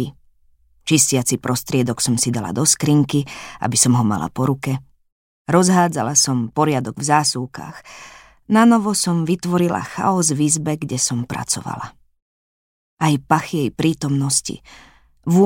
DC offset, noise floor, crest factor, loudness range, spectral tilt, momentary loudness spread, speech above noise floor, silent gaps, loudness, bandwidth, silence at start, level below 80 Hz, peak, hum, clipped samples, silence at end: under 0.1%; -55 dBFS; 18 dB; 4 LU; -4.5 dB/octave; 16 LU; 37 dB; 5.12-5.45 s, 12.22-12.97 s; -18 LUFS; 16.5 kHz; 0 s; -54 dBFS; 0 dBFS; none; under 0.1%; 0 s